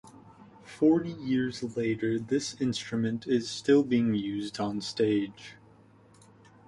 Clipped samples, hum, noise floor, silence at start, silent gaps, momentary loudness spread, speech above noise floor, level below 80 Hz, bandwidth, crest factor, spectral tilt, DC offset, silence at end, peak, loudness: under 0.1%; none; -57 dBFS; 0.05 s; none; 8 LU; 29 dB; -64 dBFS; 11.5 kHz; 18 dB; -5.5 dB/octave; under 0.1%; 1.15 s; -12 dBFS; -29 LUFS